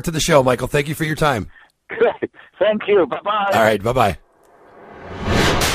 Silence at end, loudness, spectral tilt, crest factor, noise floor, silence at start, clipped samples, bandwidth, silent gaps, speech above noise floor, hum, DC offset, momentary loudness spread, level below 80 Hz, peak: 0 s; -18 LUFS; -4.5 dB/octave; 18 dB; -49 dBFS; 0.05 s; under 0.1%; 15.5 kHz; none; 32 dB; none; under 0.1%; 15 LU; -36 dBFS; 0 dBFS